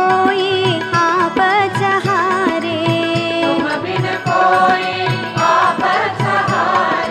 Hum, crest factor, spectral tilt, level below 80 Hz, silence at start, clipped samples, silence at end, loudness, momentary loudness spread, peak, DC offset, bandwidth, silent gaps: none; 14 dB; -5.5 dB/octave; -54 dBFS; 0 s; under 0.1%; 0 s; -15 LUFS; 5 LU; -2 dBFS; under 0.1%; 12.5 kHz; none